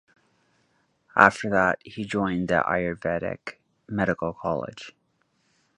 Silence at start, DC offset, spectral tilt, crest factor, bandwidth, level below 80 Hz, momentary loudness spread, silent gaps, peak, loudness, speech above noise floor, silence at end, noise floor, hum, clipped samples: 1.15 s; under 0.1%; -6 dB/octave; 26 dB; 11 kHz; -54 dBFS; 19 LU; none; 0 dBFS; -24 LUFS; 46 dB; 0.85 s; -70 dBFS; none; under 0.1%